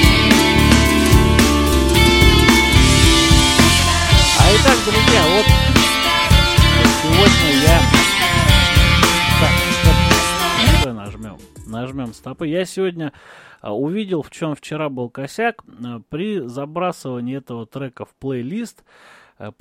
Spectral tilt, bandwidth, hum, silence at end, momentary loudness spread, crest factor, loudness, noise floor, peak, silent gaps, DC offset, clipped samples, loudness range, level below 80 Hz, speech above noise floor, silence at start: -4 dB/octave; 16.5 kHz; none; 0.1 s; 18 LU; 14 dB; -13 LUFS; -35 dBFS; 0 dBFS; none; under 0.1%; under 0.1%; 14 LU; -22 dBFS; 10 dB; 0 s